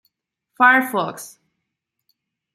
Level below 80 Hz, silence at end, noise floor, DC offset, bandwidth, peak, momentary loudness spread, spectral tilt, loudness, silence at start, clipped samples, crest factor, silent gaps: -76 dBFS; 1.25 s; -79 dBFS; under 0.1%; 16 kHz; -2 dBFS; 23 LU; -3.5 dB/octave; -17 LUFS; 0.6 s; under 0.1%; 20 dB; none